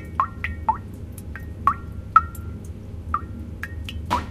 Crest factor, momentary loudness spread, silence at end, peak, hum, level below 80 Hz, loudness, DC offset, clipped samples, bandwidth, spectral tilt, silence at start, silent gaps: 26 dB; 17 LU; 0 s; 0 dBFS; none; -38 dBFS; -26 LUFS; under 0.1%; under 0.1%; 15.5 kHz; -6 dB/octave; 0 s; none